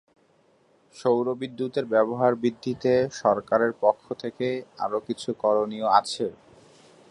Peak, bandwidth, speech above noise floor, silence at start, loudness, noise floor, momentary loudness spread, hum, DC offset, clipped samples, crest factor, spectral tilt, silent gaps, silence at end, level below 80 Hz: -4 dBFS; 11.5 kHz; 38 dB; 0.95 s; -25 LUFS; -62 dBFS; 9 LU; none; under 0.1%; under 0.1%; 22 dB; -5.5 dB/octave; none; 0.8 s; -66 dBFS